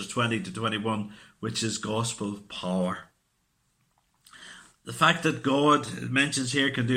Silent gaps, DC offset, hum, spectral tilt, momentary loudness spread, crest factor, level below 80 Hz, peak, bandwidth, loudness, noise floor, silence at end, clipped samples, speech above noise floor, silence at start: none; under 0.1%; none; -4 dB/octave; 18 LU; 22 dB; -64 dBFS; -6 dBFS; 16 kHz; -27 LUFS; -73 dBFS; 0 s; under 0.1%; 45 dB; 0 s